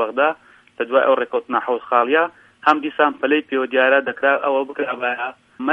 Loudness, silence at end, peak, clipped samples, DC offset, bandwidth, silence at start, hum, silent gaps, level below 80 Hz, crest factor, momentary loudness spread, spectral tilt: -19 LUFS; 0 s; 0 dBFS; under 0.1%; under 0.1%; 6.2 kHz; 0 s; none; none; -70 dBFS; 20 dB; 9 LU; -5 dB/octave